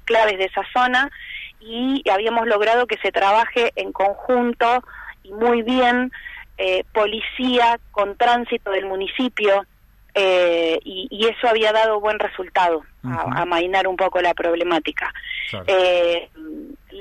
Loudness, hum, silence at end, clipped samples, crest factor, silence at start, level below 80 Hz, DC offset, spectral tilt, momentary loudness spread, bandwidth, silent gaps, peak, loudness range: -19 LUFS; none; 0 s; under 0.1%; 14 dB; 0.05 s; -50 dBFS; under 0.1%; -4.5 dB/octave; 11 LU; 13 kHz; none; -6 dBFS; 2 LU